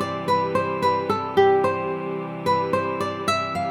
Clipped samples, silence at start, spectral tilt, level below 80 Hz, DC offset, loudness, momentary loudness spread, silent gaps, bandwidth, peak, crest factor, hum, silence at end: under 0.1%; 0 s; -5.5 dB/octave; -62 dBFS; under 0.1%; -23 LUFS; 8 LU; none; 15 kHz; -6 dBFS; 16 dB; none; 0 s